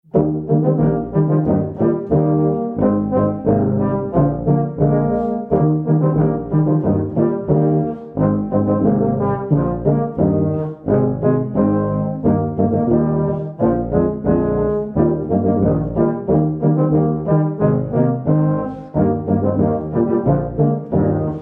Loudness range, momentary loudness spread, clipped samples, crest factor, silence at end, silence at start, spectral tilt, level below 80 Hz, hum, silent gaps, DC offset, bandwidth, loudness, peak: 1 LU; 3 LU; under 0.1%; 16 dB; 0 s; 0.15 s; -14 dB/octave; -38 dBFS; none; none; under 0.1%; 2.5 kHz; -17 LUFS; -2 dBFS